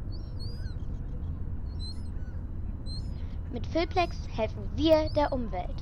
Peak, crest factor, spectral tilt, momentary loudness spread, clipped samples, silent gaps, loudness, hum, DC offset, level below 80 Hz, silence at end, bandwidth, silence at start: -10 dBFS; 20 dB; -7 dB/octave; 14 LU; under 0.1%; none; -32 LUFS; none; under 0.1%; -38 dBFS; 0 s; 15 kHz; 0 s